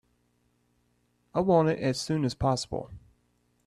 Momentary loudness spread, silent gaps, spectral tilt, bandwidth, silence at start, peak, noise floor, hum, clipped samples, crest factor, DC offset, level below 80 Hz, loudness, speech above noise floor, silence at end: 13 LU; none; -6 dB/octave; 13 kHz; 1.35 s; -10 dBFS; -71 dBFS; 60 Hz at -55 dBFS; under 0.1%; 20 dB; under 0.1%; -54 dBFS; -28 LUFS; 44 dB; 0.7 s